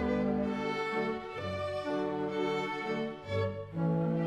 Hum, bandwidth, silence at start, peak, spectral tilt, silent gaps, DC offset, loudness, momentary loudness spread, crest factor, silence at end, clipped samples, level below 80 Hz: none; 9.8 kHz; 0 s; -20 dBFS; -7.5 dB/octave; none; under 0.1%; -34 LUFS; 5 LU; 14 dB; 0 s; under 0.1%; -56 dBFS